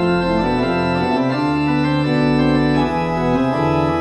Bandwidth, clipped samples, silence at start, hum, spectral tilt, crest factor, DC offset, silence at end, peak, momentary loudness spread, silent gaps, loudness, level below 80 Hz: 10.5 kHz; under 0.1%; 0 s; none; -7.5 dB/octave; 12 dB; under 0.1%; 0 s; -4 dBFS; 3 LU; none; -17 LUFS; -36 dBFS